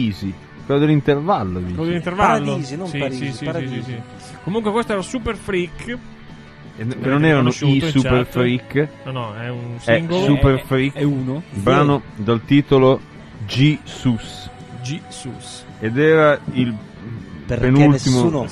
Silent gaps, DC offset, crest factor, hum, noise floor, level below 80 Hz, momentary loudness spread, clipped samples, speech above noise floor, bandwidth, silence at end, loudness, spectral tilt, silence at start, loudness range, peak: none; under 0.1%; 18 dB; none; -39 dBFS; -40 dBFS; 17 LU; under 0.1%; 21 dB; 13 kHz; 0 s; -18 LUFS; -6.5 dB/octave; 0 s; 6 LU; -2 dBFS